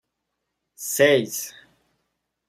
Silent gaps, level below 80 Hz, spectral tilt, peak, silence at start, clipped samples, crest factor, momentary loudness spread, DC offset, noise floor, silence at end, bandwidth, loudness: none; -70 dBFS; -3 dB/octave; -4 dBFS; 0.8 s; under 0.1%; 22 dB; 17 LU; under 0.1%; -79 dBFS; 1 s; 16 kHz; -21 LUFS